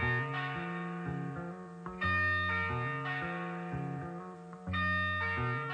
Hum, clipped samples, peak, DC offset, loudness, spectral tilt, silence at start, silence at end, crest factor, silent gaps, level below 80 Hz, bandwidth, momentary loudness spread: none; under 0.1%; -20 dBFS; under 0.1%; -34 LUFS; -7 dB/octave; 0 s; 0 s; 14 dB; none; -58 dBFS; 9.2 kHz; 14 LU